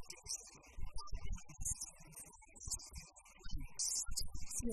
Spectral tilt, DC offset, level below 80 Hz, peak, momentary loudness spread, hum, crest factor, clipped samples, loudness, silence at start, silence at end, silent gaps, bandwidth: -2 dB/octave; under 0.1%; -50 dBFS; -24 dBFS; 16 LU; none; 18 dB; under 0.1%; -44 LUFS; 0 s; 0 s; none; 13 kHz